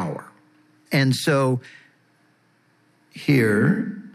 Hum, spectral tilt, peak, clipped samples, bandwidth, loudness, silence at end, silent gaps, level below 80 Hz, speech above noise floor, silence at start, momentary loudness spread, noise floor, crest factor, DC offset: none; -6 dB/octave; -6 dBFS; under 0.1%; 14 kHz; -21 LUFS; 0.05 s; none; -74 dBFS; 41 dB; 0 s; 11 LU; -62 dBFS; 16 dB; under 0.1%